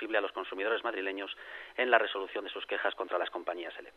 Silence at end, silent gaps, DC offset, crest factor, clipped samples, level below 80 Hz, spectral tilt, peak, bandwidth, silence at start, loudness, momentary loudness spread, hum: 0.05 s; none; under 0.1%; 26 dB; under 0.1%; -76 dBFS; -3.5 dB/octave; -8 dBFS; 12.5 kHz; 0 s; -33 LUFS; 13 LU; none